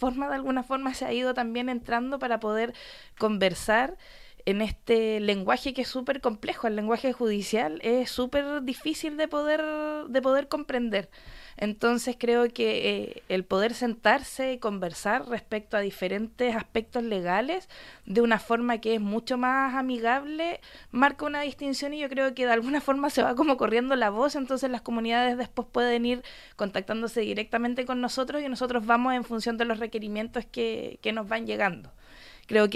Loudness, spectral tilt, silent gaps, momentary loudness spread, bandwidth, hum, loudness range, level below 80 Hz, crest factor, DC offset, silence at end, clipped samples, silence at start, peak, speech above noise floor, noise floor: -28 LUFS; -4.5 dB/octave; none; 8 LU; 15 kHz; none; 3 LU; -54 dBFS; 20 dB; under 0.1%; 0 s; under 0.1%; 0 s; -8 dBFS; 23 dB; -50 dBFS